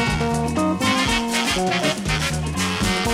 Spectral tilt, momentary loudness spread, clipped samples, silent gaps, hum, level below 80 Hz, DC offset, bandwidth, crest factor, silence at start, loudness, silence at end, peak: -4 dB/octave; 3 LU; under 0.1%; none; none; -34 dBFS; under 0.1%; 16 kHz; 12 dB; 0 s; -20 LUFS; 0 s; -8 dBFS